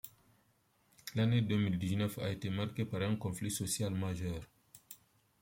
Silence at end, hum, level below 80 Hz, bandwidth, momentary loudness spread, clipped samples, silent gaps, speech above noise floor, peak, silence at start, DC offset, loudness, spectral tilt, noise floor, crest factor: 0.45 s; none; -64 dBFS; 16.5 kHz; 21 LU; under 0.1%; none; 38 dB; -20 dBFS; 0.05 s; under 0.1%; -36 LUFS; -5.5 dB/octave; -73 dBFS; 18 dB